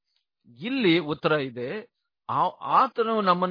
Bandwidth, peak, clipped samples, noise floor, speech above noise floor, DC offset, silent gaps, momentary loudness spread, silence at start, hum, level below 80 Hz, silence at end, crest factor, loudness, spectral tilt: 5.2 kHz; -6 dBFS; under 0.1%; -64 dBFS; 39 dB; under 0.1%; none; 13 LU; 0.6 s; none; -72 dBFS; 0 s; 20 dB; -25 LUFS; -8 dB/octave